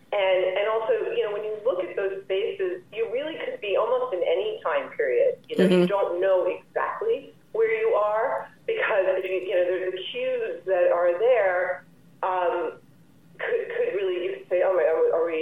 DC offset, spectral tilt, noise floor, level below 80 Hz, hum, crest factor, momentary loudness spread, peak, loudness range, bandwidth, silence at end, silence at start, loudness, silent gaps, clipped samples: 0.1%; -7 dB/octave; -55 dBFS; -76 dBFS; none; 16 dB; 9 LU; -8 dBFS; 4 LU; 11 kHz; 0 s; 0.1 s; -25 LUFS; none; under 0.1%